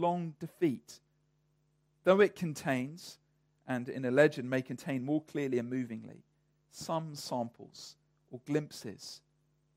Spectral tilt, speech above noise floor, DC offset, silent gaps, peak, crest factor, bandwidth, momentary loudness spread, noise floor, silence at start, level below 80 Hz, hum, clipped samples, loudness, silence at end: -6 dB/octave; 41 dB; under 0.1%; none; -12 dBFS; 22 dB; 16 kHz; 23 LU; -74 dBFS; 0 s; -78 dBFS; none; under 0.1%; -33 LUFS; 0.6 s